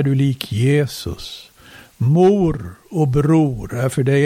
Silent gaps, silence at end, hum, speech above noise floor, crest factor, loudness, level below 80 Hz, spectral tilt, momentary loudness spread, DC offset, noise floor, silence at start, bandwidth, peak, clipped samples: none; 0 s; none; 25 dB; 16 dB; -17 LUFS; -40 dBFS; -7.5 dB/octave; 15 LU; under 0.1%; -42 dBFS; 0 s; 16 kHz; -2 dBFS; under 0.1%